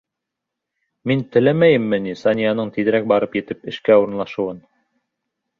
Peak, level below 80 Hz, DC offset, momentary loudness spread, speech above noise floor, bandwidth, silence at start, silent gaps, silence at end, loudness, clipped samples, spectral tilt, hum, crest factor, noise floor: -2 dBFS; -58 dBFS; under 0.1%; 11 LU; 64 dB; 6.8 kHz; 1.05 s; none; 1 s; -18 LUFS; under 0.1%; -8 dB/octave; none; 18 dB; -82 dBFS